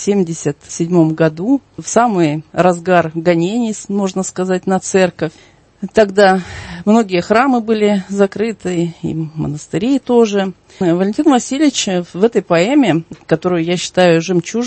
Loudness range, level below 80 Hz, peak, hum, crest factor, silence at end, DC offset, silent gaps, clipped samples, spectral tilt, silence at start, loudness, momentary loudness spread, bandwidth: 2 LU; -50 dBFS; 0 dBFS; none; 14 dB; 0 s; under 0.1%; none; under 0.1%; -5.5 dB/octave; 0 s; -15 LUFS; 9 LU; 8.8 kHz